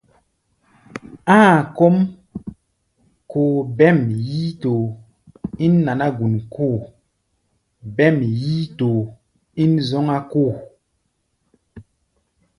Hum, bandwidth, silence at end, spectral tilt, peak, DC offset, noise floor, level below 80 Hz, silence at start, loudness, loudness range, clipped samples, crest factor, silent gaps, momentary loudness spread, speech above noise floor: none; 11 kHz; 0.75 s; -8 dB/octave; 0 dBFS; under 0.1%; -70 dBFS; -54 dBFS; 0.95 s; -18 LUFS; 5 LU; under 0.1%; 20 dB; none; 20 LU; 53 dB